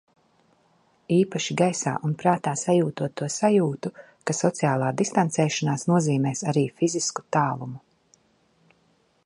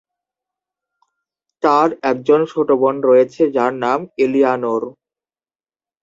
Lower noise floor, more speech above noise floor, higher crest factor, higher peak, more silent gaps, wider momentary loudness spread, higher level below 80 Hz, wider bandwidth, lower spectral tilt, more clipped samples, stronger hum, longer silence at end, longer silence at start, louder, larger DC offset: second, -65 dBFS vs under -90 dBFS; second, 41 dB vs over 75 dB; about the same, 20 dB vs 16 dB; second, -6 dBFS vs -2 dBFS; neither; about the same, 8 LU vs 7 LU; about the same, -68 dBFS vs -66 dBFS; first, 11.5 kHz vs 7.6 kHz; second, -5.5 dB/octave vs -7 dB/octave; neither; neither; first, 1.45 s vs 1.1 s; second, 1.1 s vs 1.65 s; second, -24 LUFS vs -16 LUFS; neither